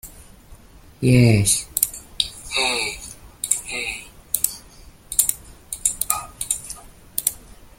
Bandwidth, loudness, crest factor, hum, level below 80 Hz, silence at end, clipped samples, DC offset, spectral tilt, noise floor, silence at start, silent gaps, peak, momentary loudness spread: 17 kHz; -21 LUFS; 24 dB; none; -44 dBFS; 0.4 s; under 0.1%; under 0.1%; -3.5 dB/octave; -45 dBFS; 0.05 s; none; 0 dBFS; 19 LU